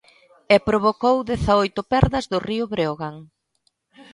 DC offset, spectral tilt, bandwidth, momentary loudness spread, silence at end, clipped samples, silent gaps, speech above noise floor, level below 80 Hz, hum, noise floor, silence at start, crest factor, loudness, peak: under 0.1%; -6.5 dB/octave; 11.5 kHz; 7 LU; 0.1 s; under 0.1%; none; 49 dB; -38 dBFS; none; -69 dBFS; 0.5 s; 20 dB; -20 LUFS; -2 dBFS